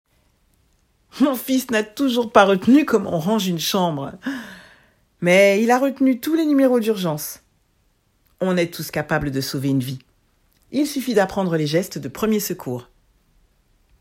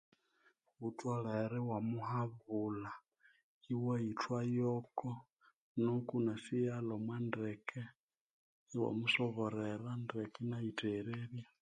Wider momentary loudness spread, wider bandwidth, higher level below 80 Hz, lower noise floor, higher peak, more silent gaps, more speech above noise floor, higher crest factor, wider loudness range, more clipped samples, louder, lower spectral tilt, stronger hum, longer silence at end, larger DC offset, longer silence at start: first, 14 LU vs 10 LU; first, 16.5 kHz vs 9.6 kHz; first, -54 dBFS vs -78 dBFS; second, -63 dBFS vs -75 dBFS; first, 0 dBFS vs -20 dBFS; second, none vs 3.43-3.61 s, 5.56-5.75 s, 7.95-8.08 s, 8.21-8.67 s; first, 44 dB vs 36 dB; about the same, 20 dB vs 20 dB; first, 6 LU vs 2 LU; neither; first, -20 LUFS vs -40 LUFS; second, -5 dB/octave vs -7 dB/octave; neither; first, 1.2 s vs 0.15 s; neither; first, 1.15 s vs 0.8 s